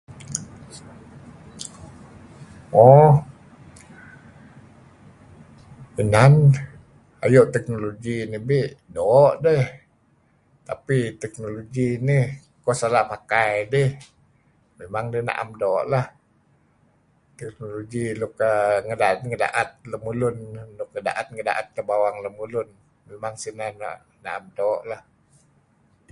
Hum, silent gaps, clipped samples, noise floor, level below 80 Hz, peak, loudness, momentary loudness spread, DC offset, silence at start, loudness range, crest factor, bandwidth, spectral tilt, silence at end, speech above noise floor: none; none; under 0.1%; -61 dBFS; -54 dBFS; 0 dBFS; -21 LUFS; 20 LU; under 0.1%; 0.1 s; 9 LU; 22 dB; 11.5 kHz; -7 dB/octave; 1.1 s; 41 dB